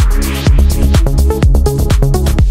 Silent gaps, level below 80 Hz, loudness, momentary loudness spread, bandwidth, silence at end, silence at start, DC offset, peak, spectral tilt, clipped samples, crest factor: none; -10 dBFS; -12 LUFS; 2 LU; 16.5 kHz; 0 s; 0 s; under 0.1%; 0 dBFS; -6 dB/octave; under 0.1%; 8 dB